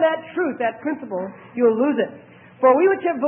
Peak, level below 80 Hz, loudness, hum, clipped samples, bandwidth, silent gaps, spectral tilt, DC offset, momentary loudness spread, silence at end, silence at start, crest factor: -2 dBFS; -74 dBFS; -20 LUFS; none; under 0.1%; 3.4 kHz; none; -10.5 dB/octave; under 0.1%; 12 LU; 0 s; 0 s; 18 dB